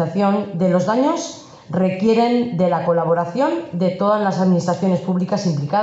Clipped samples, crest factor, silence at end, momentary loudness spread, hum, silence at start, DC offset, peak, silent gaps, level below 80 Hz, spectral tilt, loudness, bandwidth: under 0.1%; 12 dB; 0 s; 4 LU; none; 0 s; under 0.1%; -6 dBFS; none; -62 dBFS; -7 dB/octave; -18 LUFS; 8 kHz